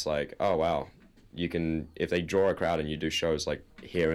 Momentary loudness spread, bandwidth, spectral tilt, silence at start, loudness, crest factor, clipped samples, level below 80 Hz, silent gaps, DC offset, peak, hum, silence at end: 9 LU; 13.5 kHz; -5 dB/octave; 0 s; -30 LUFS; 16 dB; under 0.1%; -50 dBFS; none; under 0.1%; -14 dBFS; none; 0 s